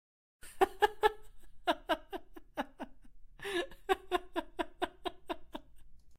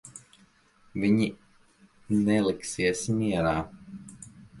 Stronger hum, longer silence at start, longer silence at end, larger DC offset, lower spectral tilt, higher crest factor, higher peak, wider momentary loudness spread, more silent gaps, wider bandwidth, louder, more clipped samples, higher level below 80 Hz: neither; first, 0.45 s vs 0.05 s; about the same, 0 s vs 0 s; neither; second, -3.5 dB/octave vs -5.5 dB/octave; first, 24 dB vs 18 dB; second, -14 dBFS vs -10 dBFS; about the same, 20 LU vs 22 LU; neither; first, 16 kHz vs 11.5 kHz; second, -36 LUFS vs -27 LUFS; neither; about the same, -58 dBFS vs -54 dBFS